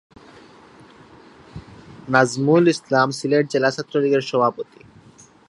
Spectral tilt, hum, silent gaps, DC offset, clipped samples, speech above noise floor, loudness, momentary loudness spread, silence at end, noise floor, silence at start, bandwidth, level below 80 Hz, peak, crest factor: -5.5 dB/octave; none; none; under 0.1%; under 0.1%; 31 dB; -19 LUFS; 24 LU; 0.85 s; -49 dBFS; 1.55 s; 11.5 kHz; -58 dBFS; 0 dBFS; 22 dB